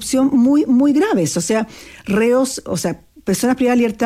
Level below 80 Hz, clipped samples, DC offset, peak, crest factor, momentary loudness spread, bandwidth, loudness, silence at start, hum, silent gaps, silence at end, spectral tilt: -50 dBFS; under 0.1%; under 0.1%; -6 dBFS; 10 dB; 10 LU; 15.5 kHz; -16 LUFS; 0 s; none; none; 0 s; -5 dB/octave